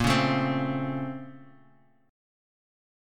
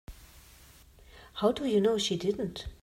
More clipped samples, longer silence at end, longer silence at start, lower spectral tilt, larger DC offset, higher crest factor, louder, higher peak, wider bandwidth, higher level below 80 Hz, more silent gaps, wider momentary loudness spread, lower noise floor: neither; first, 1.65 s vs 0.1 s; about the same, 0 s vs 0.1 s; about the same, -5.5 dB/octave vs -5 dB/octave; neither; about the same, 20 dB vs 18 dB; about the same, -28 LUFS vs -29 LUFS; first, -10 dBFS vs -14 dBFS; about the same, 16 kHz vs 16 kHz; about the same, -50 dBFS vs -54 dBFS; neither; about the same, 17 LU vs 15 LU; first, -61 dBFS vs -56 dBFS